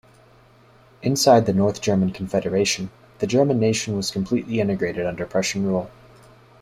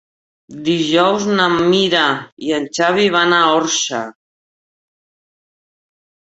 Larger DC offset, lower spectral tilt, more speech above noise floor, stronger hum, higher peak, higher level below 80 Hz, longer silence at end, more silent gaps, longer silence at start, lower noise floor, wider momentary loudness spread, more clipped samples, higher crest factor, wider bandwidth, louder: neither; first, -5 dB/octave vs -3.5 dB/octave; second, 32 dB vs over 75 dB; neither; about the same, -2 dBFS vs 0 dBFS; about the same, -54 dBFS vs -58 dBFS; second, 0.7 s vs 2.3 s; second, none vs 2.32-2.37 s; first, 1 s vs 0.5 s; second, -52 dBFS vs under -90 dBFS; about the same, 11 LU vs 9 LU; neither; about the same, 20 dB vs 16 dB; first, 15 kHz vs 8.2 kHz; second, -21 LUFS vs -15 LUFS